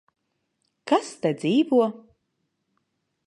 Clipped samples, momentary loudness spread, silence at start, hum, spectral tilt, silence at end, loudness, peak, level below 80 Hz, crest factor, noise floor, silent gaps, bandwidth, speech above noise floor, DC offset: under 0.1%; 7 LU; 0.85 s; none; -6 dB/octave; 1.3 s; -23 LUFS; -8 dBFS; -78 dBFS; 18 dB; -76 dBFS; none; 11 kHz; 54 dB; under 0.1%